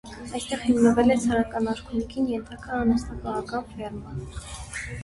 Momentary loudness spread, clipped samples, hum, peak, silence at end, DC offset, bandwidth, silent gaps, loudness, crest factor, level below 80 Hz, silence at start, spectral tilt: 16 LU; under 0.1%; none; -8 dBFS; 0 s; under 0.1%; 11.5 kHz; none; -25 LUFS; 18 dB; -44 dBFS; 0.05 s; -5.5 dB/octave